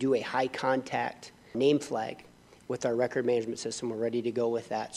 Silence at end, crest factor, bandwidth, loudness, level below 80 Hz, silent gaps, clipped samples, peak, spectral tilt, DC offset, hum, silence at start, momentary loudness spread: 0 s; 16 dB; 12.5 kHz; -31 LUFS; -70 dBFS; none; under 0.1%; -14 dBFS; -5 dB/octave; under 0.1%; none; 0 s; 11 LU